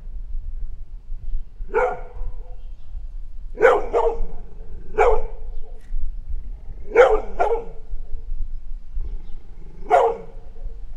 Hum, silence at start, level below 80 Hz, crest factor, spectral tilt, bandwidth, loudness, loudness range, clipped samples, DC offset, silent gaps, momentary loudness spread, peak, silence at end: none; 0 s; -28 dBFS; 22 dB; -6 dB/octave; 7.4 kHz; -20 LUFS; 4 LU; under 0.1%; under 0.1%; none; 24 LU; 0 dBFS; 0 s